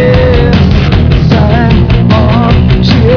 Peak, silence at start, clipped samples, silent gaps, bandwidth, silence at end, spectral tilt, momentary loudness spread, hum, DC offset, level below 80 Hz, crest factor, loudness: 0 dBFS; 0 s; 5%; none; 5.4 kHz; 0 s; -8.5 dB/octave; 1 LU; none; 0.7%; -12 dBFS; 6 dB; -7 LUFS